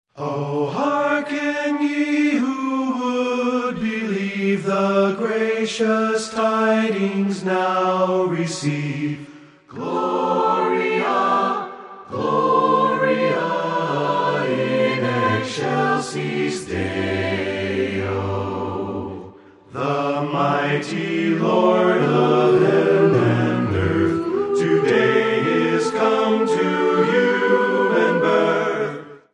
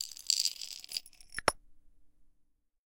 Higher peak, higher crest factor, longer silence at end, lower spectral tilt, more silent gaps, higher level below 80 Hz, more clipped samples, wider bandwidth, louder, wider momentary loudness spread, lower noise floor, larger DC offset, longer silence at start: about the same, -4 dBFS vs -6 dBFS; second, 16 dB vs 34 dB; second, 0.15 s vs 0.7 s; first, -6 dB/octave vs 0.5 dB/octave; neither; first, -48 dBFS vs -60 dBFS; neither; second, 11 kHz vs 17 kHz; first, -20 LUFS vs -33 LUFS; second, 8 LU vs 14 LU; second, -43 dBFS vs -71 dBFS; neither; first, 0.15 s vs 0 s